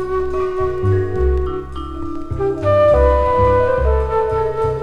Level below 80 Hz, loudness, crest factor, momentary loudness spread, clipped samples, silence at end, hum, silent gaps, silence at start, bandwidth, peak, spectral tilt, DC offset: -24 dBFS; -17 LUFS; 14 dB; 13 LU; under 0.1%; 0 s; none; none; 0 s; 6.8 kHz; -2 dBFS; -9 dB/octave; under 0.1%